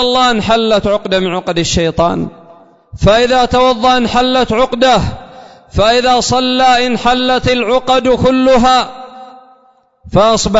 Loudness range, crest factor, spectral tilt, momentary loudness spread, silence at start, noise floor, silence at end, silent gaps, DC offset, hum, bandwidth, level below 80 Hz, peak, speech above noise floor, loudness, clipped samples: 2 LU; 12 dB; -4.5 dB/octave; 6 LU; 0 s; -50 dBFS; 0 s; none; under 0.1%; none; 8 kHz; -32 dBFS; 0 dBFS; 39 dB; -11 LUFS; under 0.1%